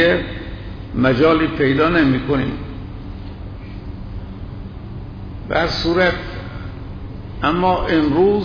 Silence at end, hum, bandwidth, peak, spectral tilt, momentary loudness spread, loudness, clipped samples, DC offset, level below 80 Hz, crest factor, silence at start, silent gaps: 0 s; none; 5.4 kHz; -4 dBFS; -7.5 dB/octave; 18 LU; -17 LUFS; under 0.1%; under 0.1%; -34 dBFS; 14 dB; 0 s; none